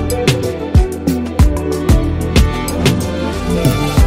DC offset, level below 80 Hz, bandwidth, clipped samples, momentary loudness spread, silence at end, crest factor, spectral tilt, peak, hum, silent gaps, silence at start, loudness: under 0.1%; -18 dBFS; 16.5 kHz; under 0.1%; 4 LU; 0 s; 14 dB; -6 dB/octave; 0 dBFS; none; none; 0 s; -15 LUFS